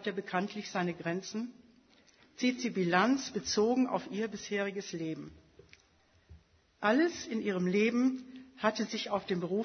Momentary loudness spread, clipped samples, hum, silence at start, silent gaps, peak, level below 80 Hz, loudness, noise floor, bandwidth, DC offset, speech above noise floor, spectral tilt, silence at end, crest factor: 11 LU; under 0.1%; none; 0 s; none; -12 dBFS; -70 dBFS; -33 LUFS; -67 dBFS; 6.6 kHz; under 0.1%; 35 dB; -5 dB/octave; 0 s; 22 dB